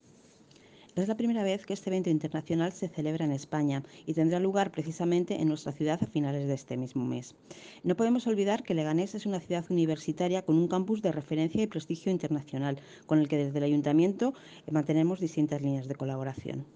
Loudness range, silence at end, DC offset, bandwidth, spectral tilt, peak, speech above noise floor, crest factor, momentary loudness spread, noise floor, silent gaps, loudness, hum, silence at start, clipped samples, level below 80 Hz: 2 LU; 0.1 s; under 0.1%; 9.6 kHz; -7 dB/octave; -14 dBFS; 29 dB; 16 dB; 8 LU; -59 dBFS; none; -30 LUFS; none; 0.95 s; under 0.1%; -70 dBFS